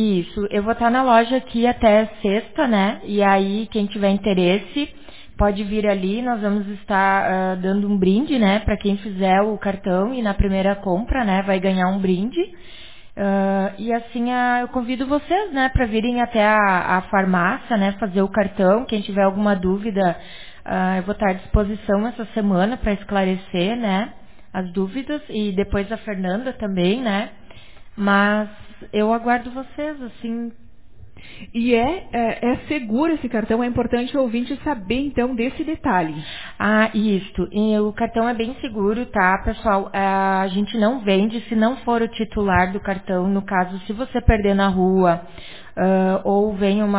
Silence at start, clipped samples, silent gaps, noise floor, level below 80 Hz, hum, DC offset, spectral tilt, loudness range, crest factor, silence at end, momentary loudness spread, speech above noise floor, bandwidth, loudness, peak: 0 s; under 0.1%; none; -46 dBFS; -36 dBFS; none; 1%; -10.5 dB/octave; 4 LU; 18 dB; 0 s; 9 LU; 26 dB; 4 kHz; -20 LUFS; -2 dBFS